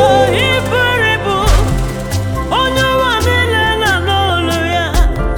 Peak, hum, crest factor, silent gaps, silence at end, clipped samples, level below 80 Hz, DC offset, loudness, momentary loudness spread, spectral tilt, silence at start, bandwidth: 0 dBFS; none; 12 dB; none; 0 s; under 0.1%; -20 dBFS; under 0.1%; -13 LUFS; 6 LU; -4.5 dB/octave; 0 s; 19.5 kHz